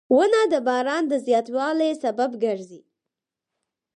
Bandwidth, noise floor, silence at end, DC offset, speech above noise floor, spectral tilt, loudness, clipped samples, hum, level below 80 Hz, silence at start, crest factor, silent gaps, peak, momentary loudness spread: 10.5 kHz; -86 dBFS; 1.2 s; under 0.1%; 64 dB; -4 dB/octave; -22 LUFS; under 0.1%; none; -76 dBFS; 0.1 s; 16 dB; none; -8 dBFS; 7 LU